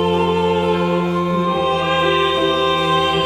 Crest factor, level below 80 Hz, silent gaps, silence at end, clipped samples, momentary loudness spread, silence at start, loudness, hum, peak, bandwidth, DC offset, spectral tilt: 12 dB; -44 dBFS; none; 0 s; under 0.1%; 3 LU; 0 s; -17 LUFS; none; -4 dBFS; 13 kHz; under 0.1%; -6 dB/octave